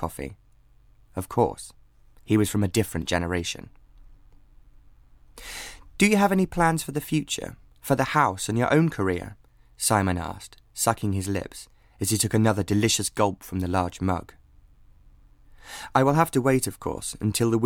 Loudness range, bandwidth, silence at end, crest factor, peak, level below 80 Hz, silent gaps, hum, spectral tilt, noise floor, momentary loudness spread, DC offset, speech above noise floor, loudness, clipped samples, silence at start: 4 LU; 18.5 kHz; 0 s; 22 dB; -4 dBFS; -48 dBFS; none; none; -5 dB/octave; -56 dBFS; 18 LU; under 0.1%; 31 dB; -24 LUFS; under 0.1%; 0 s